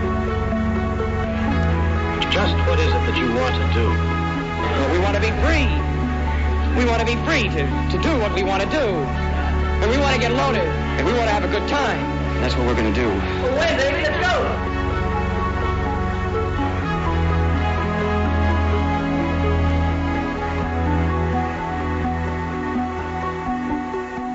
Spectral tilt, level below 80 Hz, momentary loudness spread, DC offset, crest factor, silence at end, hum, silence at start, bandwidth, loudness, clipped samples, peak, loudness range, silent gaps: -6.5 dB/octave; -26 dBFS; 5 LU; under 0.1%; 14 dB; 0 s; none; 0 s; 8 kHz; -21 LUFS; under 0.1%; -6 dBFS; 2 LU; none